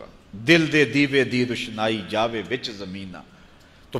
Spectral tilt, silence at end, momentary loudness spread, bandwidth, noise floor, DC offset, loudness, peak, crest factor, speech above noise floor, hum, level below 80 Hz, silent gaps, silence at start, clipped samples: -5 dB/octave; 0 s; 17 LU; 13.5 kHz; -50 dBFS; under 0.1%; -21 LUFS; -4 dBFS; 20 dB; 28 dB; none; -54 dBFS; none; 0 s; under 0.1%